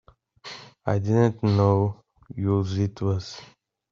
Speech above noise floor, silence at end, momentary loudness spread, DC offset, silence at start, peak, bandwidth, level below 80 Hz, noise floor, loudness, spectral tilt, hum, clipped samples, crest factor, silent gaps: 23 dB; 0.45 s; 20 LU; under 0.1%; 0.45 s; -6 dBFS; 7.2 kHz; -58 dBFS; -45 dBFS; -24 LUFS; -8 dB/octave; none; under 0.1%; 18 dB; none